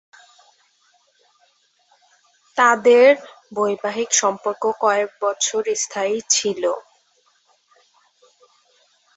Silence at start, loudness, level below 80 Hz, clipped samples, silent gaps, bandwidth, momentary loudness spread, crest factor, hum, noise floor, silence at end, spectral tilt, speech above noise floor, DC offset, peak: 2.55 s; -18 LUFS; -74 dBFS; under 0.1%; none; 8.2 kHz; 11 LU; 20 dB; none; -62 dBFS; 2.35 s; -1 dB/octave; 44 dB; under 0.1%; -2 dBFS